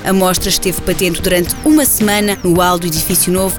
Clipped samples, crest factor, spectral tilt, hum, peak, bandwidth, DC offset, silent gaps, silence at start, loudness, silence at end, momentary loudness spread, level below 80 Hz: under 0.1%; 12 dB; -3.5 dB/octave; none; -2 dBFS; over 20 kHz; 0.4%; none; 0 s; -12 LUFS; 0 s; 4 LU; -30 dBFS